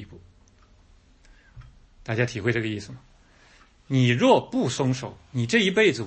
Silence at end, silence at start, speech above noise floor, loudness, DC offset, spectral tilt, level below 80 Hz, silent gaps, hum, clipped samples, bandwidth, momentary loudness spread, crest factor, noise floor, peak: 0 s; 0 s; 33 dB; -23 LUFS; under 0.1%; -5.5 dB/octave; -56 dBFS; none; none; under 0.1%; 8.8 kHz; 14 LU; 20 dB; -56 dBFS; -6 dBFS